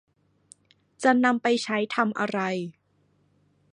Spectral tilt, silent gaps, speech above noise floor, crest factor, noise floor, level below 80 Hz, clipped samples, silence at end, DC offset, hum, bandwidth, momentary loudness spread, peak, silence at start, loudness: -5 dB/octave; none; 43 dB; 20 dB; -67 dBFS; -78 dBFS; under 0.1%; 1 s; under 0.1%; 50 Hz at -70 dBFS; 10.5 kHz; 9 LU; -6 dBFS; 1 s; -25 LUFS